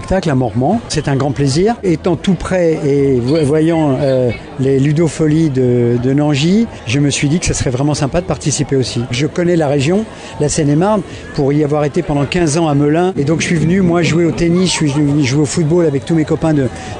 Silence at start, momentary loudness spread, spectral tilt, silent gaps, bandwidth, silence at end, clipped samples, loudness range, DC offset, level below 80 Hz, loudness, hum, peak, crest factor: 0 s; 4 LU; -6 dB/octave; none; 10.5 kHz; 0 s; under 0.1%; 2 LU; under 0.1%; -34 dBFS; -14 LUFS; none; -4 dBFS; 10 dB